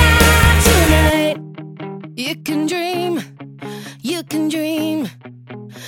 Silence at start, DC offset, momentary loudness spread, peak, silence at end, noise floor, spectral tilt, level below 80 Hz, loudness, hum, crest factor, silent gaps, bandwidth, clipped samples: 0 s; under 0.1%; 22 LU; 0 dBFS; 0 s; -35 dBFS; -4.5 dB/octave; -24 dBFS; -16 LUFS; none; 16 dB; none; 18 kHz; under 0.1%